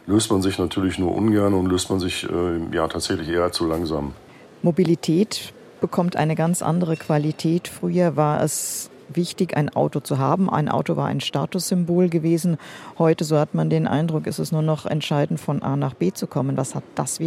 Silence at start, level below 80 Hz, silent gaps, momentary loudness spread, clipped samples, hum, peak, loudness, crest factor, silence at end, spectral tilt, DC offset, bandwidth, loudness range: 0.05 s; -50 dBFS; none; 6 LU; under 0.1%; none; -4 dBFS; -22 LUFS; 18 dB; 0 s; -6 dB/octave; under 0.1%; 15.5 kHz; 2 LU